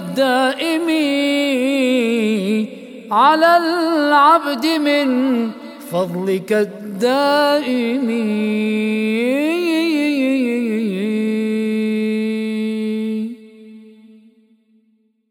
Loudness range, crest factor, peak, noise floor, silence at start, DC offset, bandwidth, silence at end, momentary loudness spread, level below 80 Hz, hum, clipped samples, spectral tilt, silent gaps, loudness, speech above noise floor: 6 LU; 16 dB; -2 dBFS; -61 dBFS; 0 s; under 0.1%; 17 kHz; 1.4 s; 8 LU; -72 dBFS; none; under 0.1%; -5 dB/octave; none; -17 LUFS; 45 dB